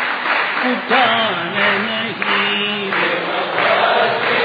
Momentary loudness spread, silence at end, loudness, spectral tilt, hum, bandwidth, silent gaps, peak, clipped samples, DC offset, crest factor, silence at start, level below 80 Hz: 5 LU; 0 s; -16 LUFS; -6 dB/octave; none; 5 kHz; none; -2 dBFS; under 0.1%; under 0.1%; 16 dB; 0 s; -70 dBFS